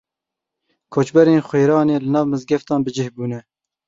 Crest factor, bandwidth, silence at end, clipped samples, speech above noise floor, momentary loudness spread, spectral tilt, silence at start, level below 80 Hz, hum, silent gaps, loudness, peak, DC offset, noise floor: 16 dB; 7.8 kHz; 0.5 s; under 0.1%; 68 dB; 12 LU; -7.5 dB/octave; 0.9 s; -60 dBFS; none; none; -18 LUFS; -2 dBFS; under 0.1%; -84 dBFS